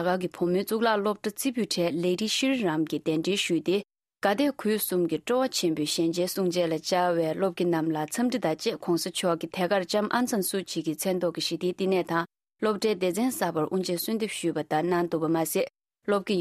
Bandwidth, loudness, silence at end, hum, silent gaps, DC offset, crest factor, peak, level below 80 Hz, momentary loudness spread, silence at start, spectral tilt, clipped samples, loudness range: 15.5 kHz; -27 LUFS; 0 s; none; none; under 0.1%; 18 dB; -10 dBFS; -70 dBFS; 4 LU; 0 s; -4.5 dB/octave; under 0.1%; 2 LU